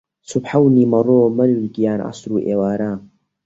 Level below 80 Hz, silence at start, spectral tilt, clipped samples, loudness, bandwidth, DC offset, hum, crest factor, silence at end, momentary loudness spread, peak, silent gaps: -56 dBFS; 0.3 s; -8 dB/octave; under 0.1%; -17 LUFS; 8 kHz; under 0.1%; none; 14 dB; 0.4 s; 11 LU; -2 dBFS; none